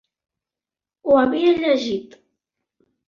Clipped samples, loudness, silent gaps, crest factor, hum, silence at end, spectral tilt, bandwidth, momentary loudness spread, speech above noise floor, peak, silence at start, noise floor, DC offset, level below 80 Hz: under 0.1%; -19 LUFS; none; 18 dB; none; 1 s; -5.5 dB/octave; 7.2 kHz; 12 LU; 72 dB; -4 dBFS; 1.05 s; -90 dBFS; under 0.1%; -60 dBFS